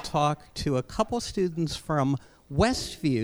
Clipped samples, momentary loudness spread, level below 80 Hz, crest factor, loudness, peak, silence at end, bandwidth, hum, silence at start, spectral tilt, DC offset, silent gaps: under 0.1%; 6 LU; -44 dBFS; 18 dB; -28 LUFS; -8 dBFS; 0 s; over 20 kHz; none; 0 s; -5.5 dB/octave; under 0.1%; none